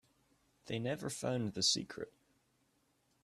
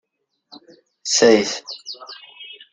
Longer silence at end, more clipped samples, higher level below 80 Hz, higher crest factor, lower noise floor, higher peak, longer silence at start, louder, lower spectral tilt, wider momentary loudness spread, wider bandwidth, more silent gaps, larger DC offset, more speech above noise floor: first, 1.15 s vs 0.25 s; neither; second, -74 dBFS vs -64 dBFS; about the same, 22 dB vs 20 dB; first, -77 dBFS vs -59 dBFS; second, -20 dBFS vs -2 dBFS; about the same, 0.65 s vs 0.55 s; second, -37 LUFS vs -16 LUFS; first, -3.5 dB/octave vs -2 dB/octave; second, 15 LU vs 24 LU; first, 14 kHz vs 9.6 kHz; neither; neither; about the same, 39 dB vs 41 dB